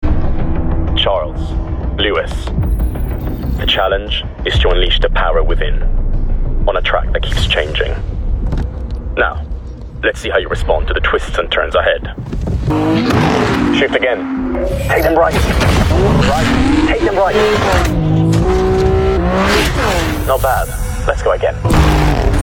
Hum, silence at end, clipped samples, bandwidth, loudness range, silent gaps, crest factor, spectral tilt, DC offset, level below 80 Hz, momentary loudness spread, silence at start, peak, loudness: none; 0 s; under 0.1%; 17 kHz; 5 LU; none; 12 dB; -5.5 dB/octave; under 0.1%; -18 dBFS; 9 LU; 0 s; 0 dBFS; -15 LUFS